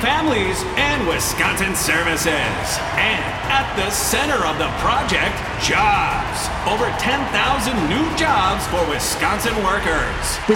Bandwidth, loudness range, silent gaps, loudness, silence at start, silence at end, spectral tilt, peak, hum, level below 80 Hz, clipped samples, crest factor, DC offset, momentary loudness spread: 17.5 kHz; 1 LU; none; -18 LUFS; 0 s; 0 s; -3 dB/octave; -2 dBFS; none; -32 dBFS; under 0.1%; 18 dB; under 0.1%; 4 LU